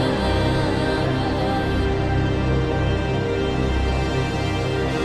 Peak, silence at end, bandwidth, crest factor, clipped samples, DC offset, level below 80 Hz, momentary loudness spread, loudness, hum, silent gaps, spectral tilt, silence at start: -8 dBFS; 0 s; 12 kHz; 12 dB; under 0.1%; under 0.1%; -28 dBFS; 2 LU; -22 LUFS; none; none; -6.5 dB/octave; 0 s